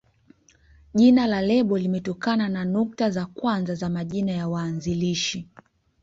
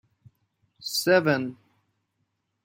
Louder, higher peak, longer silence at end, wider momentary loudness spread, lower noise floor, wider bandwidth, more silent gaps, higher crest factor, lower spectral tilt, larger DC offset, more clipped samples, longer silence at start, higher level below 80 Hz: about the same, -24 LUFS vs -24 LUFS; about the same, -6 dBFS vs -8 dBFS; second, 0.6 s vs 1.1 s; second, 10 LU vs 16 LU; second, -57 dBFS vs -77 dBFS; second, 7.8 kHz vs 16.5 kHz; neither; about the same, 16 dB vs 20 dB; first, -6 dB/octave vs -4 dB/octave; neither; neither; first, 0.95 s vs 0.8 s; first, -54 dBFS vs -72 dBFS